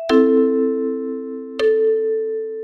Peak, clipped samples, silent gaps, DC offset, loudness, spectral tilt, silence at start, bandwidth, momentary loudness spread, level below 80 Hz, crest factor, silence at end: -2 dBFS; under 0.1%; none; under 0.1%; -19 LUFS; -5.5 dB/octave; 0 s; 7 kHz; 12 LU; -58 dBFS; 16 dB; 0 s